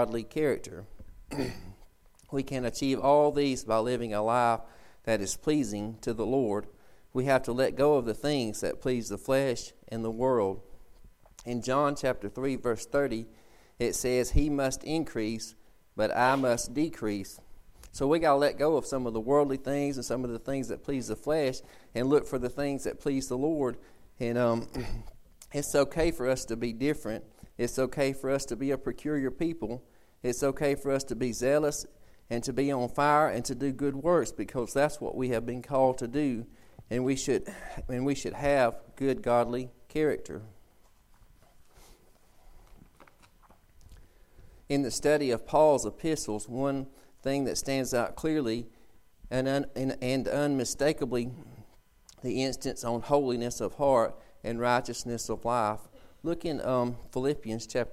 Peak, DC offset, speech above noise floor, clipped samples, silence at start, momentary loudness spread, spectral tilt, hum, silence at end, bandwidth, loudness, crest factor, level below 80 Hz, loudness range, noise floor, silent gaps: -10 dBFS; under 0.1%; 31 dB; under 0.1%; 0 s; 11 LU; -5 dB/octave; none; 0 s; 16 kHz; -30 LUFS; 20 dB; -48 dBFS; 3 LU; -60 dBFS; none